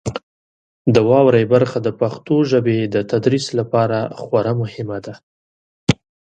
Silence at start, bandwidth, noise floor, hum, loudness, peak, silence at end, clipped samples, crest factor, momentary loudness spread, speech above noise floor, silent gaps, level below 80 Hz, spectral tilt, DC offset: 0.05 s; 9.4 kHz; under -90 dBFS; none; -17 LUFS; 0 dBFS; 0.4 s; under 0.1%; 18 dB; 14 LU; over 74 dB; 0.23-0.85 s, 5.23-5.87 s; -50 dBFS; -7 dB/octave; under 0.1%